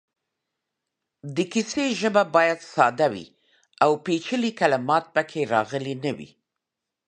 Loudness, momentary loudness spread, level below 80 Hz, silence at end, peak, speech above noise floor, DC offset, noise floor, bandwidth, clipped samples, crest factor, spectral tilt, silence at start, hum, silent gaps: -23 LUFS; 10 LU; -70 dBFS; 0.8 s; -4 dBFS; 62 dB; under 0.1%; -85 dBFS; 10 kHz; under 0.1%; 22 dB; -4.5 dB/octave; 1.25 s; none; none